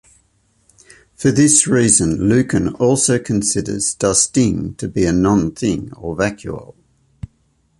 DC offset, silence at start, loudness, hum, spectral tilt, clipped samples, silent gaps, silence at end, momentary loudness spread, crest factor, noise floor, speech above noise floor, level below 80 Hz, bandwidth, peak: under 0.1%; 1.2 s; -15 LUFS; none; -4.5 dB/octave; under 0.1%; none; 1.15 s; 18 LU; 18 dB; -60 dBFS; 45 dB; -40 dBFS; 11.5 kHz; 0 dBFS